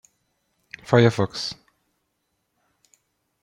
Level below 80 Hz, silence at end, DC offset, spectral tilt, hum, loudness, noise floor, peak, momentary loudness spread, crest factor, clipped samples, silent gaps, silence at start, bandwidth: -62 dBFS; 1.9 s; under 0.1%; -6 dB/octave; none; -21 LUFS; -75 dBFS; -2 dBFS; 25 LU; 24 dB; under 0.1%; none; 0.9 s; 11.5 kHz